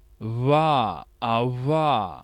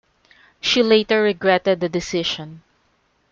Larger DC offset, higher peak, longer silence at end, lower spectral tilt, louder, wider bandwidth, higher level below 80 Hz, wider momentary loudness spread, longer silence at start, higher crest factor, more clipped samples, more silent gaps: neither; second, -8 dBFS vs -4 dBFS; second, 0 s vs 0.75 s; first, -8 dB/octave vs -4 dB/octave; second, -23 LUFS vs -19 LUFS; first, 11.5 kHz vs 7.6 kHz; about the same, -54 dBFS vs -56 dBFS; about the same, 10 LU vs 10 LU; second, 0.2 s vs 0.65 s; about the same, 16 dB vs 18 dB; neither; neither